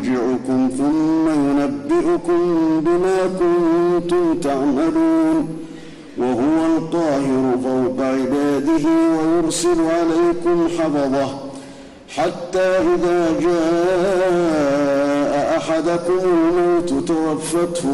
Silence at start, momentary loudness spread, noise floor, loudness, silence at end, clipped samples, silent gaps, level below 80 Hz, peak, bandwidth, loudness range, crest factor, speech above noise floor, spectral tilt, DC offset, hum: 0 s; 5 LU; -38 dBFS; -18 LUFS; 0 s; under 0.1%; none; -46 dBFS; -10 dBFS; 12 kHz; 2 LU; 8 dB; 21 dB; -6 dB/octave; under 0.1%; none